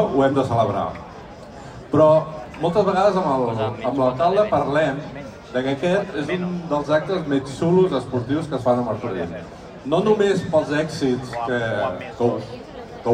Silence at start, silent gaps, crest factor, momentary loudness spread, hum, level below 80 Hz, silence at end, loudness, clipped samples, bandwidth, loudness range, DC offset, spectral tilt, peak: 0 s; none; 16 dB; 17 LU; none; -50 dBFS; 0 s; -21 LUFS; under 0.1%; 10.5 kHz; 3 LU; under 0.1%; -7 dB/octave; -4 dBFS